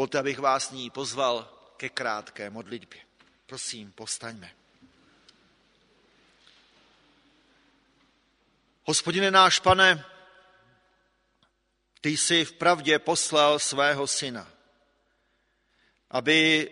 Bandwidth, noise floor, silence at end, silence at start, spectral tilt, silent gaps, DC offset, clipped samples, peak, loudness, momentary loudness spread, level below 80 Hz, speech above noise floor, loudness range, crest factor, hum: 11 kHz; -73 dBFS; 0 s; 0 s; -2 dB/octave; none; under 0.1%; under 0.1%; -2 dBFS; -24 LUFS; 20 LU; -62 dBFS; 48 dB; 16 LU; 26 dB; none